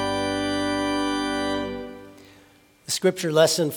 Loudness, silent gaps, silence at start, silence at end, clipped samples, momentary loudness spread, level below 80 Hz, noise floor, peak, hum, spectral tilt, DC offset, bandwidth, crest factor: -24 LUFS; none; 0 s; 0 s; under 0.1%; 17 LU; -52 dBFS; -55 dBFS; -4 dBFS; none; -4 dB/octave; under 0.1%; 18 kHz; 20 dB